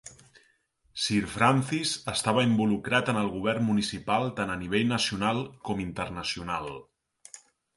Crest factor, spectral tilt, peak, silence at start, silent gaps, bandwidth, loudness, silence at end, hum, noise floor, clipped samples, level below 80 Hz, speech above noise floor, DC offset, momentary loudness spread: 22 dB; -4.5 dB/octave; -6 dBFS; 0.05 s; none; 11.5 kHz; -27 LUFS; 0.4 s; none; -68 dBFS; under 0.1%; -56 dBFS; 40 dB; under 0.1%; 13 LU